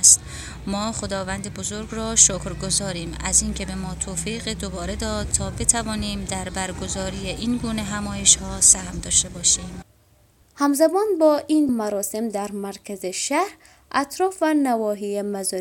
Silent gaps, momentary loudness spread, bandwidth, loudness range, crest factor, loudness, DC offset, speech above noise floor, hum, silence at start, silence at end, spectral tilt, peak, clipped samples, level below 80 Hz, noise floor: none; 14 LU; 17 kHz; 5 LU; 22 dB; -21 LUFS; under 0.1%; 34 dB; none; 0 s; 0 s; -2.5 dB/octave; 0 dBFS; under 0.1%; -38 dBFS; -57 dBFS